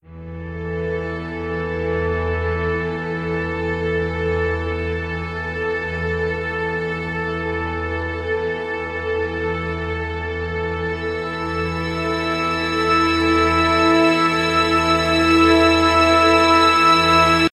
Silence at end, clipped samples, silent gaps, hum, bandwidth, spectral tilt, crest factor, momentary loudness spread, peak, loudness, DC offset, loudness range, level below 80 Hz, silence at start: 0.05 s; under 0.1%; none; none; 15 kHz; -5.5 dB/octave; 16 dB; 12 LU; -2 dBFS; -19 LUFS; under 0.1%; 9 LU; -40 dBFS; 0.1 s